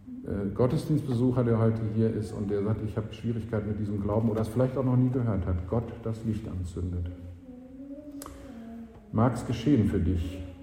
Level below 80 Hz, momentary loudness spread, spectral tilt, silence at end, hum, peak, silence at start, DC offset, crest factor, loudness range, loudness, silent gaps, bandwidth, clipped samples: -46 dBFS; 18 LU; -8.5 dB/octave; 0 s; none; -10 dBFS; 0 s; under 0.1%; 18 dB; 7 LU; -29 LUFS; none; 13.5 kHz; under 0.1%